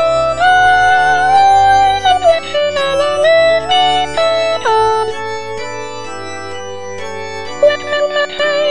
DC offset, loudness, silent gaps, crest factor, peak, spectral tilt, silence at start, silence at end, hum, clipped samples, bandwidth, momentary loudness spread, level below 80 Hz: 3%; -11 LUFS; none; 12 dB; 0 dBFS; -2.5 dB/octave; 0 s; 0 s; none; under 0.1%; 10 kHz; 16 LU; -42 dBFS